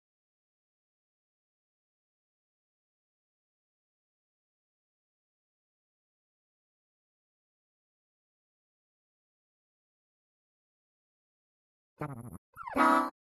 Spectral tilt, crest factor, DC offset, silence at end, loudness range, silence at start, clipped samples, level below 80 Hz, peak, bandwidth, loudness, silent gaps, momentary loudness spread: -5.5 dB/octave; 28 dB; under 0.1%; 0.1 s; 17 LU; 12 s; under 0.1%; -74 dBFS; -14 dBFS; 12.5 kHz; -27 LUFS; 12.38-12.53 s; 21 LU